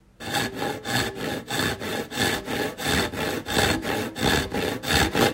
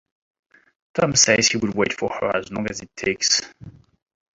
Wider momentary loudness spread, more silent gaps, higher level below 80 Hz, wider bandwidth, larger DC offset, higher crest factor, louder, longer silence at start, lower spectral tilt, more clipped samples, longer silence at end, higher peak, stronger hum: second, 7 LU vs 13 LU; neither; first, -42 dBFS vs -54 dBFS; first, 16 kHz vs 8.2 kHz; neither; about the same, 20 dB vs 22 dB; second, -25 LUFS vs -20 LUFS; second, 0.2 s vs 0.95 s; first, -3.5 dB/octave vs -2 dB/octave; neither; second, 0 s vs 0.65 s; second, -6 dBFS vs -2 dBFS; neither